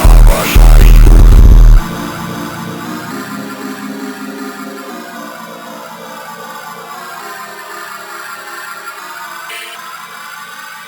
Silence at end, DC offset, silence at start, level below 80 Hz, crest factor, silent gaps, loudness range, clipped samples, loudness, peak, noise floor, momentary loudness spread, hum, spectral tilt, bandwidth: 0.45 s; under 0.1%; 0 s; -10 dBFS; 10 dB; none; 16 LU; 4%; -13 LUFS; 0 dBFS; -29 dBFS; 20 LU; none; -5.5 dB/octave; over 20 kHz